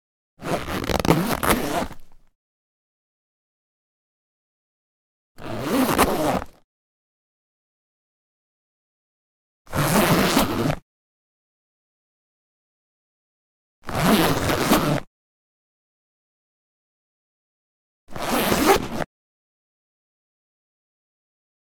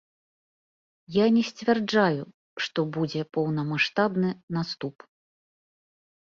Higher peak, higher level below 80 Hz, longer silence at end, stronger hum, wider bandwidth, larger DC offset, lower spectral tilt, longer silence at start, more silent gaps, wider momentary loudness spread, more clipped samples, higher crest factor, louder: first, 0 dBFS vs -8 dBFS; first, -42 dBFS vs -68 dBFS; first, 2.65 s vs 1.3 s; neither; first, 19.5 kHz vs 7.4 kHz; neither; second, -4.5 dB/octave vs -6.5 dB/octave; second, 0.4 s vs 1.1 s; first, 2.35-5.35 s, 6.64-9.65 s, 10.82-13.82 s, 15.07-18.07 s vs 2.34-2.56 s, 4.43-4.48 s; first, 14 LU vs 11 LU; neither; first, 26 dB vs 20 dB; first, -21 LUFS vs -26 LUFS